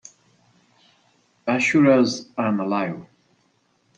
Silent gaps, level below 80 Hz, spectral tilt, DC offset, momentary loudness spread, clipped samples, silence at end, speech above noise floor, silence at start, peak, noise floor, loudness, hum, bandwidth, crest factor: none; -68 dBFS; -5.5 dB/octave; under 0.1%; 14 LU; under 0.1%; 0.95 s; 45 dB; 1.45 s; -4 dBFS; -65 dBFS; -20 LUFS; none; 9.2 kHz; 20 dB